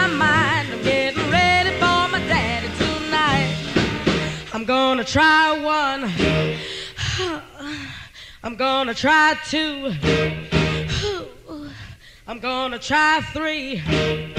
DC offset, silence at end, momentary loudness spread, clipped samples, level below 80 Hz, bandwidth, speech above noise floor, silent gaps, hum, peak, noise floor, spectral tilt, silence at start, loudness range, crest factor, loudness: under 0.1%; 0 s; 16 LU; under 0.1%; -40 dBFS; 14.5 kHz; 21 dB; none; none; -4 dBFS; -41 dBFS; -4.5 dB/octave; 0 s; 5 LU; 16 dB; -19 LUFS